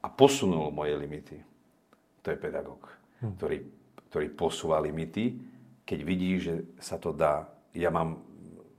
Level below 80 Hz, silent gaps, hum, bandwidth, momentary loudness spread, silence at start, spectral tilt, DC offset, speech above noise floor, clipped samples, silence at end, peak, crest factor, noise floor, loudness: -60 dBFS; none; none; 15.5 kHz; 19 LU; 0.05 s; -5.5 dB/octave; under 0.1%; 35 dB; under 0.1%; 0.15 s; -4 dBFS; 28 dB; -65 dBFS; -31 LUFS